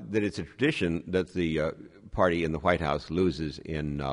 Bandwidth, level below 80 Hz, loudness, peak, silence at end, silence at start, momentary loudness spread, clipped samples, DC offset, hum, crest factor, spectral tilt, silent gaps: 10.5 kHz; -46 dBFS; -29 LUFS; -8 dBFS; 0 s; 0 s; 8 LU; under 0.1%; under 0.1%; none; 20 dB; -6.5 dB/octave; none